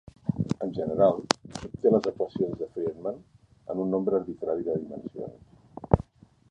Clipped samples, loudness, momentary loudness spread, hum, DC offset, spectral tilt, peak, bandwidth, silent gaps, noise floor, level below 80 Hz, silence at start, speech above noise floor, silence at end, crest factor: under 0.1%; -28 LUFS; 17 LU; none; under 0.1%; -6 dB/octave; -2 dBFS; 11 kHz; none; -48 dBFS; -48 dBFS; 0.25 s; 20 dB; 0.5 s; 28 dB